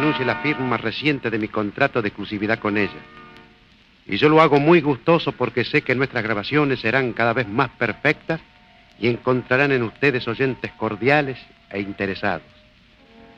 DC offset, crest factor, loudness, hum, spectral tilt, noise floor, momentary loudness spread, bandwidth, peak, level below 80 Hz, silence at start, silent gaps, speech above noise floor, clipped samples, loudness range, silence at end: under 0.1%; 20 dB; -20 LUFS; none; -7.5 dB/octave; -53 dBFS; 10 LU; 7.4 kHz; -2 dBFS; -54 dBFS; 0 s; none; 33 dB; under 0.1%; 5 LU; 1 s